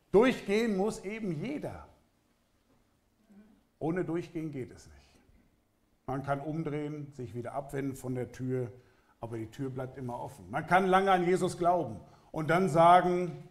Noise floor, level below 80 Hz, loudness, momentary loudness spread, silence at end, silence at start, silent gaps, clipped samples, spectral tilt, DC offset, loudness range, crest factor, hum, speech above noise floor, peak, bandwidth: -71 dBFS; -60 dBFS; -31 LUFS; 17 LU; 0.05 s; 0.15 s; none; under 0.1%; -6.5 dB/octave; under 0.1%; 13 LU; 20 dB; none; 41 dB; -10 dBFS; 14.5 kHz